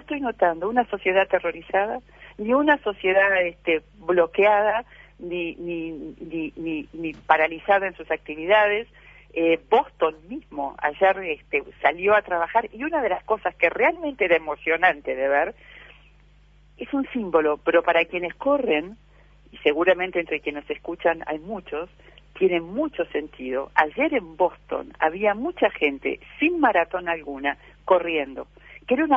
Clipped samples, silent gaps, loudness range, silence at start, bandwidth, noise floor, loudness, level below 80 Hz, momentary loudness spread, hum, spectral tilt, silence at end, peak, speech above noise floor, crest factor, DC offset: under 0.1%; none; 4 LU; 0.1 s; 6.2 kHz; -54 dBFS; -23 LUFS; -54 dBFS; 13 LU; none; -7 dB/octave; 0 s; 0 dBFS; 31 dB; 22 dB; under 0.1%